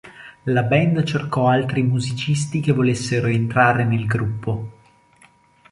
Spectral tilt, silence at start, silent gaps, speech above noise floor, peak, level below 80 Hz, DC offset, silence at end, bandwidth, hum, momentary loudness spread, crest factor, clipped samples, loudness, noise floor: -6.5 dB/octave; 0.05 s; none; 35 dB; -2 dBFS; -50 dBFS; under 0.1%; 1 s; 11.5 kHz; none; 10 LU; 18 dB; under 0.1%; -20 LUFS; -54 dBFS